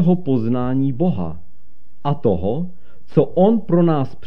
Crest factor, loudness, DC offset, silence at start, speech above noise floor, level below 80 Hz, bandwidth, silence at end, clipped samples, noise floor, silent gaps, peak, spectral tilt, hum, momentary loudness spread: 18 dB; -19 LUFS; 6%; 0 s; 39 dB; -46 dBFS; 5.2 kHz; 0 s; under 0.1%; -57 dBFS; none; -2 dBFS; -11 dB/octave; none; 11 LU